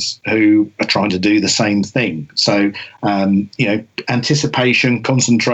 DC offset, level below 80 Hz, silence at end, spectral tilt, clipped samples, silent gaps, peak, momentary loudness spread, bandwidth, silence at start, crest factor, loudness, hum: under 0.1%; -56 dBFS; 0 s; -4.5 dB/octave; under 0.1%; none; -4 dBFS; 6 LU; 8.4 kHz; 0 s; 12 dB; -15 LUFS; none